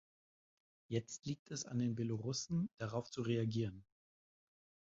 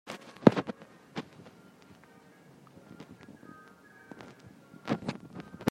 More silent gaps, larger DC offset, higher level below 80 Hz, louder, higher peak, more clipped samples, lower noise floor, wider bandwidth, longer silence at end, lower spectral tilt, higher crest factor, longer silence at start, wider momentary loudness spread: first, 1.39-1.46 s vs none; neither; second, -72 dBFS vs -66 dBFS; second, -41 LUFS vs -31 LUFS; second, -24 dBFS vs -2 dBFS; neither; first, under -90 dBFS vs -57 dBFS; second, 7.6 kHz vs 12.5 kHz; first, 1.15 s vs 0 s; about the same, -7 dB/octave vs -7 dB/octave; second, 18 dB vs 34 dB; first, 0.9 s vs 0.05 s; second, 7 LU vs 30 LU